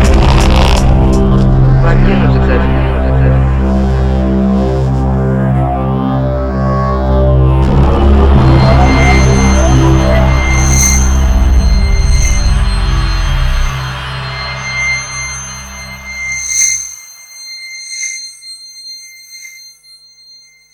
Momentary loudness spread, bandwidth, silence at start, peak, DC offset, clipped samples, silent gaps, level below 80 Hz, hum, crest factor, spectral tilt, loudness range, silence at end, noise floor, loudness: 16 LU; 15.5 kHz; 0 s; 0 dBFS; under 0.1%; under 0.1%; none; -12 dBFS; none; 10 dB; -5 dB/octave; 8 LU; 1.05 s; -41 dBFS; -11 LUFS